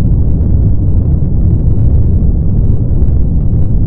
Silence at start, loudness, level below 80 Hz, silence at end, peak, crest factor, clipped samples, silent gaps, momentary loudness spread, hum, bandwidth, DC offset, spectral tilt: 0 s; -12 LUFS; -12 dBFS; 0 s; 0 dBFS; 8 dB; 0.4%; none; 2 LU; none; 1.6 kHz; under 0.1%; -14.5 dB/octave